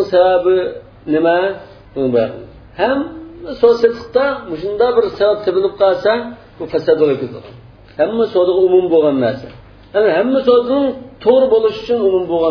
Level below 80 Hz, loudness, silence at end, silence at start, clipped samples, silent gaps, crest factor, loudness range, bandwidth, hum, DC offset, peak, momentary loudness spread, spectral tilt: -48 dBFS; -15 LUFS; 0 s; 0 s; under 0.1%; none; 14 dB; 3 LU; 5.4 kHz; none; under 0.1%; 0 dBFS; 15 LU; -7.5 dB/octave